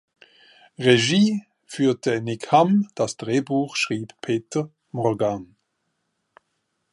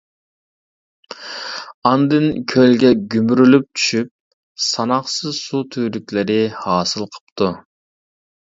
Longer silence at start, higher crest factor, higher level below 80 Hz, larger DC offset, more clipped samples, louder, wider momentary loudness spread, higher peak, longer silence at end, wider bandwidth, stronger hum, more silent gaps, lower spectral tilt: second, 0.8 s vs 1.1 s; about the same, 22 dB vs 18 dB; second, -64 dBFS vs -56 dBFS; neither; neither; second, -22 LUFS vs -17 LUFS; second, 11 LU vs 16 LU; about the same, -2 dBFS vs 0 dBFS; first, 1.5 s vs 0.95 s; first, 11.5 kHz vs 7.8 kHz; neither; second, none vs 1.74-1.82 s, 4.11-4.55 s, 7.21-7.36 s; about the same, -5 dB/octave vs -5 dB/octave